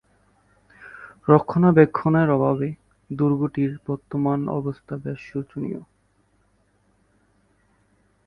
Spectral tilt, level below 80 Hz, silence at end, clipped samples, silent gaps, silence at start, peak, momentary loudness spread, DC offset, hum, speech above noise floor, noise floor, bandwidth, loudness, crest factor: -11 dB/octave; -58 dBFS; 2.45 s; under 0.1%; none; 0.8 s; 0 dBFS; 19 LU; under 0.1%; 50 Hz at -55 dBFS; 43 dB; -64 dBFS; 5.6 kHz; -22 LUFS; 24 dB